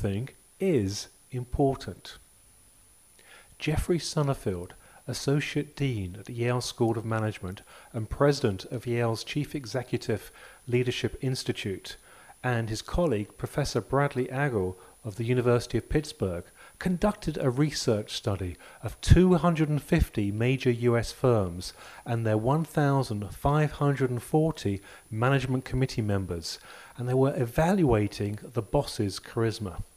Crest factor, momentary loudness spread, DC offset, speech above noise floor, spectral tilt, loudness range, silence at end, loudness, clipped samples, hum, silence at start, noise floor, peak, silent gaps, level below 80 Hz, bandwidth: 24 dB; 13 LU; under 0.1%; 31 dB; -6.5 dB/octave; 6 LU; 0.1 s; -28 LUFS; under 0.1%; none; 0 s; -58 dBFS; -4 dBFS; none; -42 dBFS; 15.5 kHz